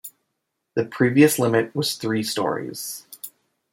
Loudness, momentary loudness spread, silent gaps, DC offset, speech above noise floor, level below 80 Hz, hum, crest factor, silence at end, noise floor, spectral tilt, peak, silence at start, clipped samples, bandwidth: -22 LUFS; 21 LU; none; under 0.1%; 57 dB; -66 dBFS; none; 20 dB; 0.45 s; -78 dBFS; -4.5 dB/octave; -4 dBFS; 0.05 s; under 0.1%; 16.5 kHz